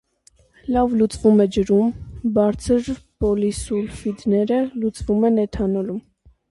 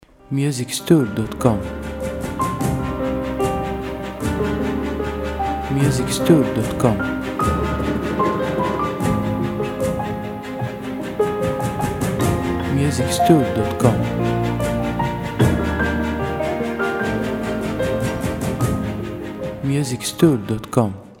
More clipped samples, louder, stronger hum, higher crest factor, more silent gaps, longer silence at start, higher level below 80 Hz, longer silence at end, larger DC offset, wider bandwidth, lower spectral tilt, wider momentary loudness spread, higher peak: neither; about the same, -20 LUFS vs -21 LUFS; neither; about the same, 16 dB vs 20 dB; neither; first, 0.65 s vs 0.3 s; second, -40 dBFS vs -34 dBFS; first, 0.5 s vs 0.05 s; neither; second, 11.5 kHz vs 17.5 kHz; about the same, -7 dB/octave vs -6 dB/octave; about the same, 9 LU vs 9 LU; second, -4 dBFS vs 0 dBFS